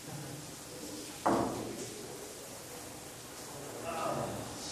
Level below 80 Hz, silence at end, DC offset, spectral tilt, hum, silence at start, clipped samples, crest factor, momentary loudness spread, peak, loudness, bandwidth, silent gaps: -64 dBFS; 0 s; under 0.1%; -4 dB/octave; none; 0 s; under 0.1%; 24 dB; 12 LU; -16 dBFS; -39 LUFS; 15.5 kHz; none